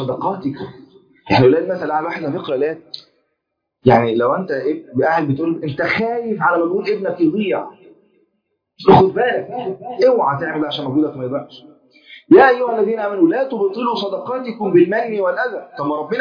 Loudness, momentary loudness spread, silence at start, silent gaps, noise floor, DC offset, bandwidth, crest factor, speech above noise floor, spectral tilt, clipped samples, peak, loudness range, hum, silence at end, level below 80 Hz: -17 LUFS; 13 LU; 0 s; none; -75 dBFS; under 0.1%; 5.2 kHz; 16 dB; 59 dB; -8.5 dB/octave; under 0.1%; 0 dBFS; 4 LU; none; 0 s; -54 dBFS